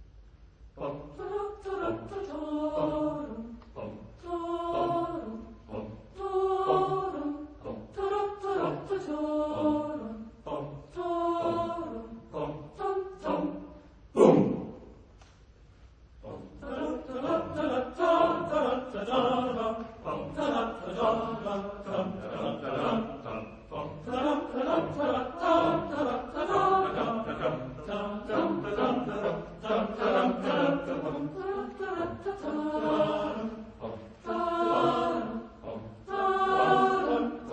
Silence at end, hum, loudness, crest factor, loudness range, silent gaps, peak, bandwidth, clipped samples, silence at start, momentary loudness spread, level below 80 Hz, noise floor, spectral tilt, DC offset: 0 s; none; -30 LUFS; 24 dB; 5 LU; none; -6 dBFS; 9.4 kHz; under 0.1%; 0 s; 15 LU; -56 dBFS; -56 dBFS; -7 dB/octave; under 0.1%